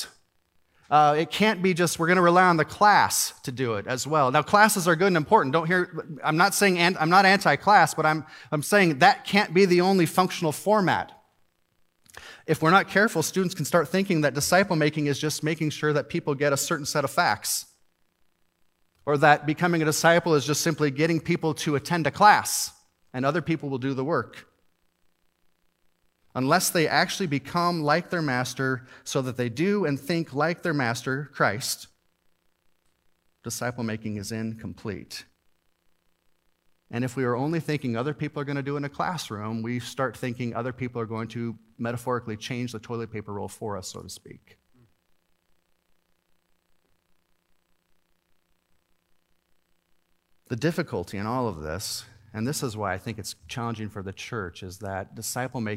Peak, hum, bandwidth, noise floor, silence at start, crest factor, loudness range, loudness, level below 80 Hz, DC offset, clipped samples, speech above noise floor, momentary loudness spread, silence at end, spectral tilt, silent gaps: -2 dBFS; none; 16 kHz; -68 dBFS; 0 s; 24 dB; 14 LU; -24 LUFS; -64 dBFS; under 0.1%; under 0.1%; 44 dB; 15 LU; 0 s; -4.5 dB/octave; none